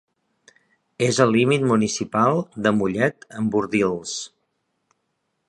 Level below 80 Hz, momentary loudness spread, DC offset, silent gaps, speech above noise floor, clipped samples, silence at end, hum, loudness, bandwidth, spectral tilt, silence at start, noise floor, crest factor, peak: -58 dBFS; 10 LU; under 0.1%; none; 54 dB; under 0.1%; 1.2 s; none; -21 LUFS; 11.5 kHz; -5 dB/octave; 1 s; -74 dBFS; 20 dB; -2 dBFS